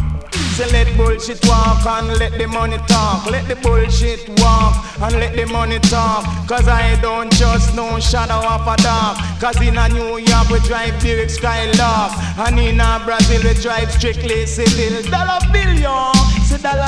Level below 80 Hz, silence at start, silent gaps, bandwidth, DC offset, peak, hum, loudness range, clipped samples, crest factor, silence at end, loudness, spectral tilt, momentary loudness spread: -18 dBFS; 0 s; none; 11 kHz; under 0.1%; 0 dBFS; none; 1 LU; under 0.1%; 14 dB; 0 s; -15 LUFS; -5 dB/octave; 6 LU